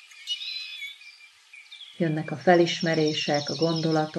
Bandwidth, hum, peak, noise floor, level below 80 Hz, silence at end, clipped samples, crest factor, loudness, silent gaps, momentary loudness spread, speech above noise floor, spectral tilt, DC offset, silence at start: 12 kHz; none; -6 dBFS; -51 dBFS; -80 dBFS; 0 s; under 0.1%; 20 dB; -25 LUFS; none; 21 LU; 27 dB; -5 dB/octave; under 0.1%; 0.15 s